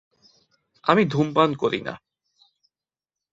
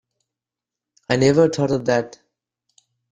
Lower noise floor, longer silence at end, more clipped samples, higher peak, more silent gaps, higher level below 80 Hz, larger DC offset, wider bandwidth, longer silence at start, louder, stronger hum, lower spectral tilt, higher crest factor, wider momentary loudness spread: about the same, under -90 dBFS vs -88 dBFS; first, 1.35 s vs 1.05 s; neither; about the same, -2 dBFS vs -4 dBFS; neither; second, -62 dBFS vs -56 dBFS; neither; second, 7.8 kHz vs 10 kHz; second, 0.85 s vs 1.1 s; second, -22 LUFS vs -19 LUFS; neither; about the same, -7 dB/octave vs -6 dB/octave; first, 24 dB vs 18 dB; first, 14 LU vs 8 LU